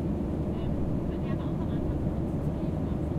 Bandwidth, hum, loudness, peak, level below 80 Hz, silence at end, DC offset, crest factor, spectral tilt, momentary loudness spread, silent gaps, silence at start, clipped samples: 10 kHz; none; -31 LUFS; -16 dBFS; -36 dBFS; 0 s; under 0.1%; 12 dB; -10 dB/octave; 1 LU; none; 0 s; under 0.1%